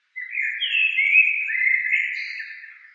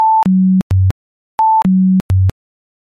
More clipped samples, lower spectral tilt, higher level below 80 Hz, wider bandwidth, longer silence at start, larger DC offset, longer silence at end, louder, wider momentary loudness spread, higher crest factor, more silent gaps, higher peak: neither; second, 10.5 dB/octave vs -9.5 dB/octave; second, under -90 dBFS vs -36 dBFS; first, 7.4 kHz vs 5.4 kHz; first, 0.15 s vs 0 s; neither; second, 0.15 s vs 0.5 s; second, -19 LUFS vs -13 LUFS; first, 17 LU vs 7 LU; first, 18 dB vs 6 dB; second, none vs 0.62-0.70 s, 0.91-1.38 s, 2.01-2.09 s; about the same, -6 dBFS vs -6 dBFS